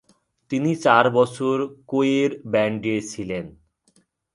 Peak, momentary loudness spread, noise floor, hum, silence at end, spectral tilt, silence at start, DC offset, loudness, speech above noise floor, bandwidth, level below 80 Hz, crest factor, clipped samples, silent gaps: 0 dBFS; 13 LU; -63 dBFS; none; 0.85 s; -5.5 dB/octave; 0.5 s; under 0.1%; -22 LUFS; 42 dB; 11.5 kHz; -60 dBFS; 22 dB; under 0.1%; none